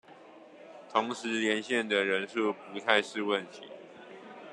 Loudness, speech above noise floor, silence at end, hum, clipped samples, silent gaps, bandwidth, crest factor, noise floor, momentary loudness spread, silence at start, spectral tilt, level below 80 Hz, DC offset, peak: -30 LUFS; 22 dB; 0 s; none; under 0.1%; none; 11 kHz; 24 dB; -53 dBFS; 21 LU; 0.1 s; -3.5 dB/octave; -82 dBFS; under 0.1%; -8 dBFS